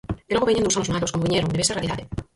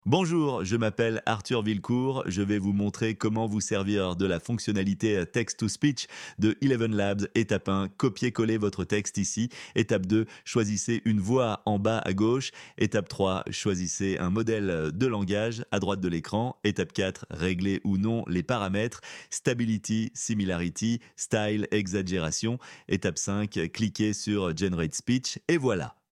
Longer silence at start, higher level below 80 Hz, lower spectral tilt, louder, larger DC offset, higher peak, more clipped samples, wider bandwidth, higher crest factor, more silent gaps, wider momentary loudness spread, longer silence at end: about the same, 0.1 s vs 0.05 s; first, -42 dBFS vs -56 dBFS; about the same, -4 dB/octave vs -5 dB/octave; first, -22 LUFS vs -28 LUFS; neither; first, -6 dBFS vs -10 dBFS; neither; about the same, 11.5 kHz vs 12 kHz; about the same, 16 dB vs 18 dB; neither; first, 7 LU vs 4 LU; about the same, 0.15 s vs 0.25 s